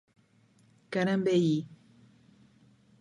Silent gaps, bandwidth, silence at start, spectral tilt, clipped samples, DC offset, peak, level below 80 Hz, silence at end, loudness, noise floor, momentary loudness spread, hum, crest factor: none; 10 kHz; 0.9 s; -7 dB/octave; under 0.1%; under 0.1%; -16 dBFS; -76 dBFS; 1.25 s; -29 LUFS; -64 dBFS; 10 LU; none; 18 dB